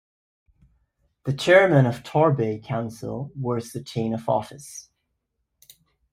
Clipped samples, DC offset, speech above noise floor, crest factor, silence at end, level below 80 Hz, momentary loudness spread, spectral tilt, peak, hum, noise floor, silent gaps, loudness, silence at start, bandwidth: under 0.1%; under 0.1%; 55 dB; 20 dB; 1.3 s; -60 dBFS; 19 LU; -6.5 dB/octave; -4 dBFS; none; -77 dBFS; none; -22 LUFS; 1.25 s; 15.5 kHz